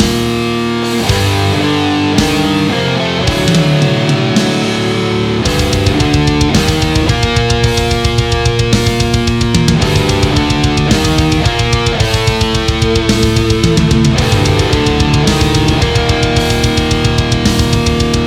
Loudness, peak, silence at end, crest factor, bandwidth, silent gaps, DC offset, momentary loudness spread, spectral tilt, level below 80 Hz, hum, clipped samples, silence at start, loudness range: -12 LUFS; 0 dBFS; 0 s; 12 dB; 16.5 kHz; none; under 0.1%; 2 LU; -5 dB/octave; -22 dBFS; none; under 0.1%; 0 s; 1 LU